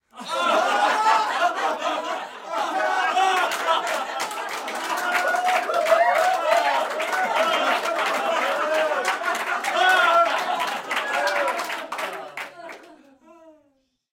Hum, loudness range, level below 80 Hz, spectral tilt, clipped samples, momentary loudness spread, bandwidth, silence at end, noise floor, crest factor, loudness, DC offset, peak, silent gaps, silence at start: none; 3 LU; -76 dBFS; -0.5 dB/octave; under 0.1%; 11 LU; 17 kHz; 0.6 s; -67 dBFS; 18 dB; -22 LUFS; under 0.1%; -6 dBFS; none; 0.15 s